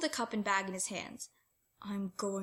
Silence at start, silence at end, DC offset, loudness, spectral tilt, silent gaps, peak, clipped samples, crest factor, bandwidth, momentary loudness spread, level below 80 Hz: 0 s; 0 s; under 0.1%; -36 LUFS; -3 dB/octave; none; -18 dBFS; under 0.1%; 20 dB; 16.5 kHz; 15 LU; -76 dBFS